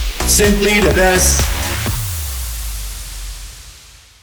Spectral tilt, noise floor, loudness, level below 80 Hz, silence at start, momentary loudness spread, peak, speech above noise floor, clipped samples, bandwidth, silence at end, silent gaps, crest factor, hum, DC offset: -3 dB/octave; -42 dBFS; -14 LUFS; -22 dBFS; 0 s; 19 LU; -2 dBFS; 30 dB; under 0.1%; over 20 kHz; 0.25 s; none; 14 dB; none; under 0.1%